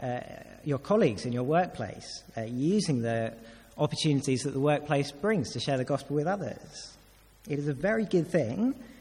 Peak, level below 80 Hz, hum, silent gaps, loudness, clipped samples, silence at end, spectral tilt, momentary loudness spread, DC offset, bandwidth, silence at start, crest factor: -14 dBFS; -60 dBFS; none; none; -30 LUFS; under 0.1%; 0.1 s; -6 dB/octave; 13 LU; under 0.1%; 14.5 kHz; 0 s; 16 dB